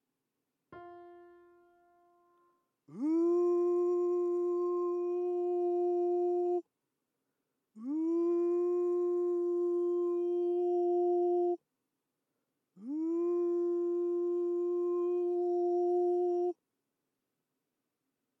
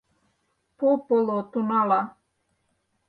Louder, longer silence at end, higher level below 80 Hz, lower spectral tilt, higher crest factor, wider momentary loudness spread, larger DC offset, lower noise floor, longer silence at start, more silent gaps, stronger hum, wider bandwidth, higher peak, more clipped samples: second, -32 LUFS vs -24 LUFS; first, 1.85 s vs 1 s; second, under -90 dBFS vs -74 dBFS; about the same, -8.5 dB/octave vs -9.5 dB/octave; second, 10 dB vs 18 dB; first, 8 LU vs 5 LU; neither; first, -86 dBFS vs -73 dBFS; about the same, 0.7 s vs 0.8 s; neither; neither; second, 2.6 kHz vs 4.8 kHz; second, -24 dBFS vs -10 dBFS; neither